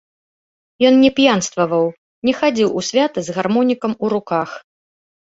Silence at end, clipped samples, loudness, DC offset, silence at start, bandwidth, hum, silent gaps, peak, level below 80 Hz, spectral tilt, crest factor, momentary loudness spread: 0.8 s; under 0.1%; -17 LUFS; under 0.1%; 0.8 s; 8 kHz; none; 1.98-2.22 s; -2 dBFS; -58 dBFS; -4.5 dB/octave; 16 dB; 10 LU